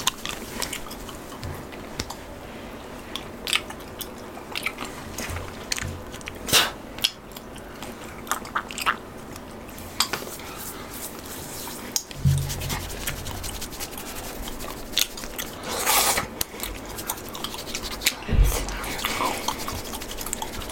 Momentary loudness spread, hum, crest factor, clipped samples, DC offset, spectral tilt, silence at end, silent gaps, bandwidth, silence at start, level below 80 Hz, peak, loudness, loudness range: 14 LU; none; 26 dB; under 0.1%; under 0.1%; -2.5 dB/octave; 0 s; none; 17 kHz; 0 s; -36 dBFS; -2 dBFS; -28 LUFS; 6 LU